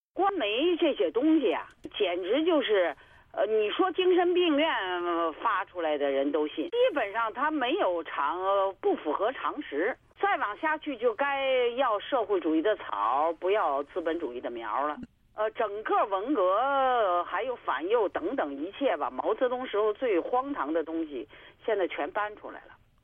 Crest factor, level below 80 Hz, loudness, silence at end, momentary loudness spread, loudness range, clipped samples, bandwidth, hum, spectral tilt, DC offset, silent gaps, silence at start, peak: 14 dB; -66 dBFS; -28 LUFS; 0.3 s; 8 LU; 3 LU; under 0.1%; 3.9 kHz; none; -6 dB/octave; under 0.1%; none; 0.15 s; -14 dBFS